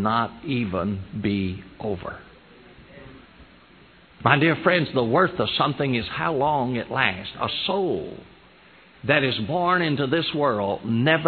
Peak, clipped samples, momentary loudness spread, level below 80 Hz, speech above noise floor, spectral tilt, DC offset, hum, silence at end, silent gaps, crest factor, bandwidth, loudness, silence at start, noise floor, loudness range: 0 dBFS; under 0.1%; 10 LU; -54 dBFS; 29 dB; -9 dB/octave; under 0.1%; none; 0 s; none; 24 dB; 4.6 kHz; -23 LUFS; 0 s; -52 dBFS; 8 LU